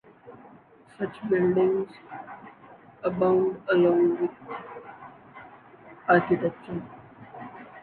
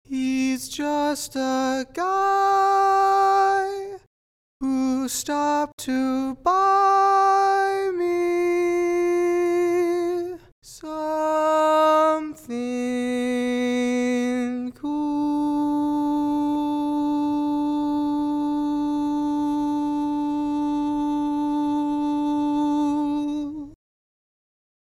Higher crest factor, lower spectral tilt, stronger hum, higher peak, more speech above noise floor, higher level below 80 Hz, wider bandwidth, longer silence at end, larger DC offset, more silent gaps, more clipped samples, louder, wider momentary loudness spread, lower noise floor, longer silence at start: first, 20 dB vs 14 dB; first, -9.5 dB/octave vs -4 dB/octave; neither; about the same, -8 dBFS vs -8 dBFS; second, 29 dB vs over 70 dB; second, -64 dBFS vs -56 dBFS; second, 4.4 kHz vs 15.5 kHz; second, 0 s vs 1.25 s; neither; second, none vs 4.07-4.60 s, 5.73-5.78 s, 10.52-10.62 s; neither; second, -25 LUFS vs -22 LUFS; first, 25 LU vs 9 LU; second, -53 dBFS vs under -90 dBFS; first, 0.25 s vs 0.1 s